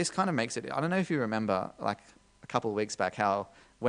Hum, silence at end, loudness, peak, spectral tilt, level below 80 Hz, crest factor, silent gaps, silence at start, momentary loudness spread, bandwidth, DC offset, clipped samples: none; 0 s; -31 LUFS; -10 dBFS; -5 dB/octave; -68 dBFS; 20 dB; none; 0 s; 6 LU; 10 kHz; under 0.1%; under 0.1%